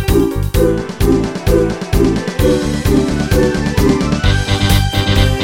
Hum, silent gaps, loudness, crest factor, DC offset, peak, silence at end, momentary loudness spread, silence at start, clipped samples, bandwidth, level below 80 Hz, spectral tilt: none; none; -14 LUFS; 12 dB; under 0.1%; 0 dBFS; 0 s; 2 LU; 0 s; under 0.1%; 17 kHz; -20 dBFS; -6 dB/octave